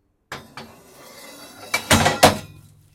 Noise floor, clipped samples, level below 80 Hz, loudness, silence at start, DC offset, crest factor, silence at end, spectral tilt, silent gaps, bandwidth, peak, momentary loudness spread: -46 dBFS; under 0.1%; -46 dBFS; -17 LUFS; 0.3 s; under 0.1%; 22 dB; 0.5 s; -3 dB/octave; none; 16.5 kHz; 0 dBFS; 25 LU